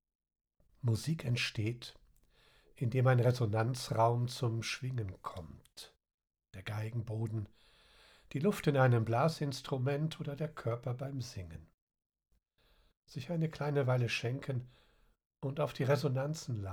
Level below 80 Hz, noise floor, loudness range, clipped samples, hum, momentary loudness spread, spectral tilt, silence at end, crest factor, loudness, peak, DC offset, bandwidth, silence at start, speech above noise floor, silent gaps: -66 dBFS; -71 dBFS; 9 LU; under 0.1%; none; 18 LU; -6.5 dB/octave; 0 s; 20 dB; -35 LUFS; -16 dBFS; under 0.1%; 15 kHz; 0.85 s; 37 dB; 6.14-6.18 s, 11.74-11.87 s, 12.06-12.10 s, 12.97-13.02 s, 15.26-15.30 s